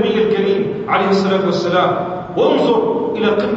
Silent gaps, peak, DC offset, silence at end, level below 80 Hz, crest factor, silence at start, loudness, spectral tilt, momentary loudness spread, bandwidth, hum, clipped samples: none; -2 dBFS; under 0.1%; 0 s; -52 dBFS; 14 dB; 0 s; -16 LUFS; -6.5 dB/octave; 4 LU; 7.8 kHz; none; under 0.1%